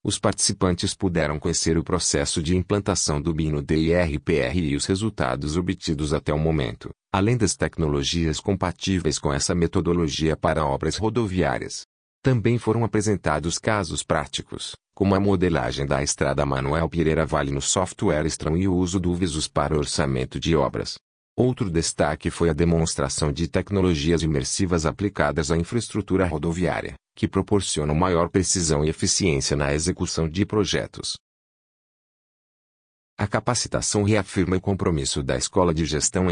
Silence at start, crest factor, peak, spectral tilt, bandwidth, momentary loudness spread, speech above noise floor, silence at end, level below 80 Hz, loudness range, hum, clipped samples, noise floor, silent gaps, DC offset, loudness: 0.05 s; 18 dB; -6 dBFS; -4.5 dB/octave; 10 kHz; 5 LU; over 67 dB; 0 s; -40 dBFS; 2 LU; none; under 0.1%; under -90 dBFS; 11.85-12.22 s, 21.01-21.36 s, 31.20-33.17 s; under 0.1%; -23 LUFS